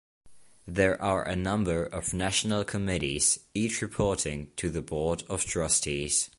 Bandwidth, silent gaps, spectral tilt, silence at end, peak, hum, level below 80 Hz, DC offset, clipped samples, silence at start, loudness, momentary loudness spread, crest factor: 11.5 kHz; none; -3.5 dB/octave; 0.1 s; -10 dBFS; none; -46 dBFS; under 0.1%; under 0.1%; 0.25 s; -28 LUFS; 7 LU; 20 dB